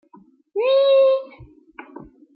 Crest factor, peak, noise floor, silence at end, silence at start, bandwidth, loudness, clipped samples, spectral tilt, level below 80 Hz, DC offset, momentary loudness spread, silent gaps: 12 dB; -8 dBFS; -52 dBFS; 0.35 s; 0.55 s; 5 kHz; -18 LUFS; under 0.1%; -7.5 dB/octave; -60 dBFS; under 0.1%; 16 LU; none